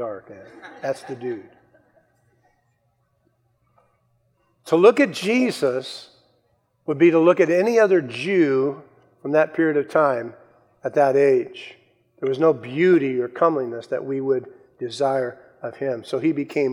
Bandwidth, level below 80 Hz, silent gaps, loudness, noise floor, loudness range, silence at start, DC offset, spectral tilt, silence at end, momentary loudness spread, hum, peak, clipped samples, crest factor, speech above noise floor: 13 kHz; -76 dBFS; none; -20 LUFS; -67 dBFS; 11 LU; 0 s; under 0.1%; -6 dB/octave; 0 s; 19 LU; none; -2 dBFS; under 0.1%; 20 dB; 47 dB